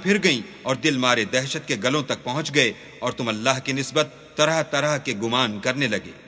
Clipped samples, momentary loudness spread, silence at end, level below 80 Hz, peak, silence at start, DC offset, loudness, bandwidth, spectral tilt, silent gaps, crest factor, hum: under 0.1%; 6 LU; 0 s; -60 dBFS; -2 dBFS; 0 s; under 0.1%; -22 LUFS; 8 kHz; -3.5 dB/octave; none; 20 dB; none